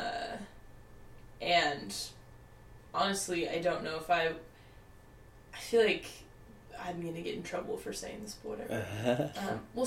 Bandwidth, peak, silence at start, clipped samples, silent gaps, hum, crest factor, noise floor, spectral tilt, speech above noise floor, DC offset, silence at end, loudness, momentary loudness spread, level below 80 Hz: 16.5 kHz; -16 dBFS; 0 s; under 0.1%; none; none; 20 dB; -56 dBFS; -4 dB/octave; 21 dB; under 0.1%; 0 s; -34 LUFS; 17 LU; -58 dBFS